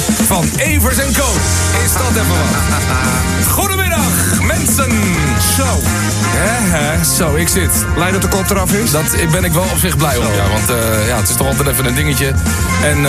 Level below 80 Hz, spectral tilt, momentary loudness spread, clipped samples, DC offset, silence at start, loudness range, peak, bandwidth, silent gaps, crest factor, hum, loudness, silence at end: -22 dBFS; -4 dB/octave; 2 LU; under 0.1%; 0.1%; 0 s; 0 LU; 0 dBFS; 16 kHz; none; 12 dB; none; -13 LUFS; 0 s